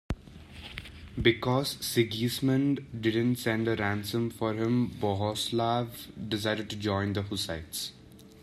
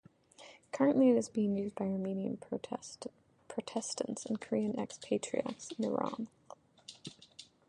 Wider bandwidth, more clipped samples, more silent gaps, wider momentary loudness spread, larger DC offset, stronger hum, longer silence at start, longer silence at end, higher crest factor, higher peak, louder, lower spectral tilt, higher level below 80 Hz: first, 15 kHz vs 11.5 kHz; neither; neither; second, 13 LU vs 21 LU; neither; neither; second, 0.1 s vs 0.4 s; second, 0 s vs 0.25 s; about the same, 22 dB vs 20 dB; first, -8 dBFS vs -16 dBFS; first, -30 LUFS vs -35 LUFS; about the same, -5 dB/octave vs -5.5 dB/octave; first, -52 dBFS vs -76 dBFS